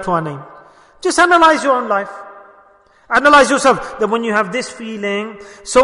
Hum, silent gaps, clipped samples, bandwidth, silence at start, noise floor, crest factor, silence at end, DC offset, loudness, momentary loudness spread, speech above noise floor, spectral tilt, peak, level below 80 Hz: none; none; under 0.1%; 11 kHz; 0 s; -49 dBFS; 14 dB; 0 s; under 0.1%; -14 LUFS; 19 LU; 35 dB; -3.5 dB/octave; 0 dBFS; -48 dBFS